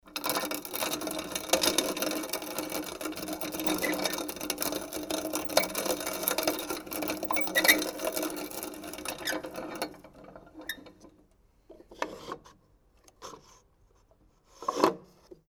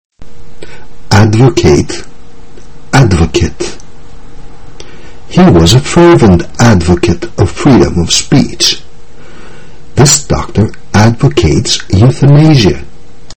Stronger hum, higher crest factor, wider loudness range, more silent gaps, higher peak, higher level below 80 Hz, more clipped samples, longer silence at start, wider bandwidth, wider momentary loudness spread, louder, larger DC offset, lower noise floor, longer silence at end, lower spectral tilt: neither; first, 28 dB vs 10 dB; first, 16 LU vs 5 LU; neither; second, -4 dBFS vs 0 dBFS; second, -62 dBFS vs -24 dBFS; second, under 0.1% vs 2%; about the same, 0.05 s vs 0.1 s; about the same, over 20 kHz vs over 20 kHz; first, 17 LU vs 9 LU; second, -31 LUFS vs -7 LUFS; second, under 0.1% vs 10%; first, -64 dBFS vs -34 dBFS; first, 0.15 s vs 0 s; second, -1.5 dB/octave vs -5 dB/octave